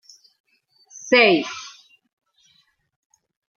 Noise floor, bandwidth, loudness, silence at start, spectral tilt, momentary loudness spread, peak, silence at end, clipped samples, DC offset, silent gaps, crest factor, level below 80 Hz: -63 dBFS; 7.2 kHz; -17 LUFS; 1.05 s; -3 dB/octave; 25 LU; -4 dBFS; 1.9 s; under 0.1%; under 0.1%; none; 22 dB; -74 dBFS